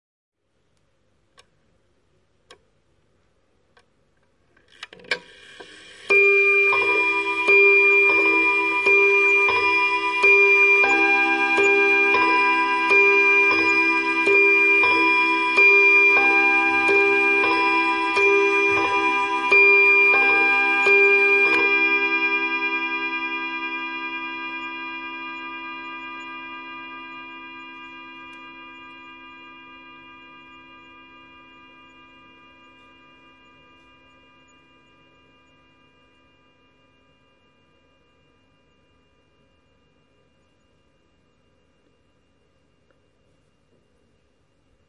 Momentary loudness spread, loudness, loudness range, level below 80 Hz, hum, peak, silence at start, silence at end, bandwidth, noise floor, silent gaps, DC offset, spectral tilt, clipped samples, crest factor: 21 LU; -16 LUFS; 21 LU; -64 dBFS; none; -6 dBFS; 4.8 s; 15.1 s; 10.5 kHz; -69 dBFS; none; under 0.1%; -3 dB/octave; under 0.1%; 16 dB